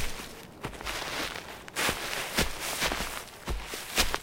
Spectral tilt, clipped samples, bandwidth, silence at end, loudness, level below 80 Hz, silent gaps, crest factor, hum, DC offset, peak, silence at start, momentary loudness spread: -2 dB/octave; under 0.1%; 16.5 kHz; 0 s; -32 LUFS; -42 dBFS; none; 24 dB; none; under 0.1%; -8 dBFS; 0 s; 11 LU